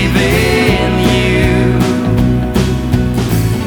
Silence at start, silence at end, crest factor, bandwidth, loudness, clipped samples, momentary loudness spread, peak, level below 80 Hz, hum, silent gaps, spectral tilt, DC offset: 0 s; 0 s; 12 dB; over 20 kHz; -12 LUFS; under 0.1%; 3 LU; 0 dBFS; -22 dBFS; none; none; -6 dB/octave; under 0.1%